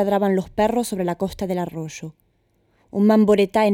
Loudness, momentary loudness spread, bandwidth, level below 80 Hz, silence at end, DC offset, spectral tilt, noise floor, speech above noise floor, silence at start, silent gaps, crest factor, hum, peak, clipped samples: -20 LUFS; 16 LU; 16.5 kHz; -50 dBFS; 0 s; under 0.1%; -6.5 dB/octave; -64 dBFS; 45 dB; 0 s; none; 14 dB; none; -6 dBFS; under 0.1%